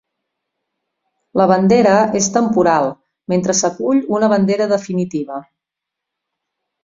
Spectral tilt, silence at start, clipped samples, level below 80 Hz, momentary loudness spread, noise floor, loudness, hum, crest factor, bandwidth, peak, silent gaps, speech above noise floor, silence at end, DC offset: -5 dB/octave; 1.35 s; under 0.1%; -56 dBFS; 11 LU; -82 dBFS; -15 LUFS; none; 16 dB; 7.8 kHz; 0 dBFS; none; 68 dB; 1.4 s; under 0.1%